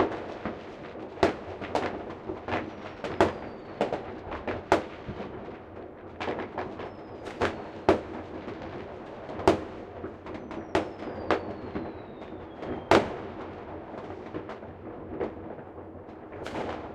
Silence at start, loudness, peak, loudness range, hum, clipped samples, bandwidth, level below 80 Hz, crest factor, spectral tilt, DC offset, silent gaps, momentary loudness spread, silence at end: 0 s; -33 LUFS; -2 dBFS; 4 LU; none; under 0.1%; 12.5 kHz; -54 dBFS; 30 dB; -6 dB/octave; under 0.1%; none; 15 LU; 0 s